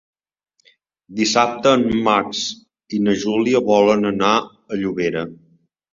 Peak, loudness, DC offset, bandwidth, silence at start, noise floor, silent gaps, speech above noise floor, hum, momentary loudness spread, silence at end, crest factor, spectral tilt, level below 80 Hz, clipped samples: -2 dBFS; -18 LUFS; under 0.1%; 7.8 kHz; 1.1 s; -69 dBFS; none; 51 dB; none; 12 LU; 0.6 s; 18 dB; -4.5 dB/octave; -54 dBFS; under 0.1%